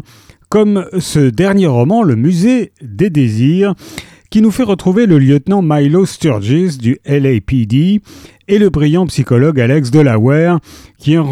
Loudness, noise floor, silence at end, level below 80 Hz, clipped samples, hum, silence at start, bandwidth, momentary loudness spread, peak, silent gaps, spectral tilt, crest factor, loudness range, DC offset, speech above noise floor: -12 LUFS; -43 dBFS; 0 s; -40 dBFS; under 0.1%; none; 0.5 s; 14.5 kHz; 6 LU; 0 dBFS; none; -7.5 dB/octave; 12 dB; 1 LU; under 0.1%; 32 dB